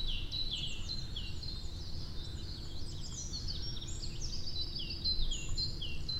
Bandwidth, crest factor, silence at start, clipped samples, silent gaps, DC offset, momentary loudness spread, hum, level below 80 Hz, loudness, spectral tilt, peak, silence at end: 10.5 kHz; 16 dB; 0 s; under 0.1%; none; under 0.1%; 8 LU; none; -40 dBFS; -39 LUFS; -3 dB/octave; -20 dBFS; 0 s